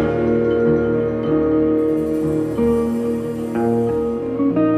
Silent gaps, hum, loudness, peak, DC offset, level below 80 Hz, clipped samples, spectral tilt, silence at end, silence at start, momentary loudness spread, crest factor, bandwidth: none; none; -19 LUFS; -6 dBFS; under 0.1%; -40 dBFS; under 0.1%; -9 dB/octave; 0 s; 0 s; 5 LU; 12 dB; 13.5 kHz